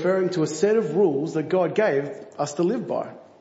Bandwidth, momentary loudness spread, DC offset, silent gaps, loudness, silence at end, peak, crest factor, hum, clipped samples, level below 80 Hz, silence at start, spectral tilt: 8 kHz; 9 LU; under 0.1%; none; -23 LUFS; 0.2 s; -8 dBFS; 14 dB; none; under 0.1%; -74 dBFS; 0 s; -6 dB/octave